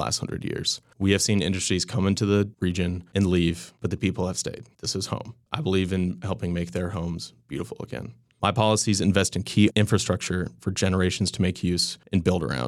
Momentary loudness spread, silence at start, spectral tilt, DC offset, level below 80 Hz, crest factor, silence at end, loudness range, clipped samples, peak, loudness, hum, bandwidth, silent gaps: 12 LU; 0 s; -5 dB/octave; under 0.1%; -48 dBFS; 18 dB; 0 s; 5 LU; under 0.1%; -6 dBFS; -25 LUFS; none; 14 kHz; none